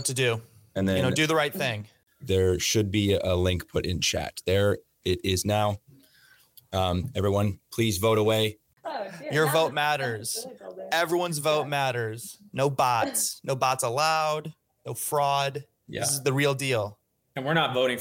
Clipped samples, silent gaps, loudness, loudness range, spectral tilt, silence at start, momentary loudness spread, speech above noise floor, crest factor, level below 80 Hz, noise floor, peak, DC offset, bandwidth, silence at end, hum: under 0.1%; none; -26 LUFS; 2 LU; -4 dB/octave; 0 s; 12 LU; 33 dB; 16 dB; -54 dBFS; -59 dBFS; -12 dBFS; under 0.1%; 17 kHz; 0 s; none